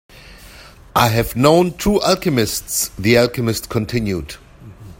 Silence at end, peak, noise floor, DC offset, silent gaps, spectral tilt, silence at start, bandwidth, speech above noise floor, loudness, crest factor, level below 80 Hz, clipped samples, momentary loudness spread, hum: 0.05 s; 0 dBFS; -41 dBFS; under 0.1%; none; -4.5 dB/octave; 0.15 s; 16.5 kHz; 25 dB; -17 LUFS; 18 dB; -38 dBFS; under 0.1%; 9 LU; none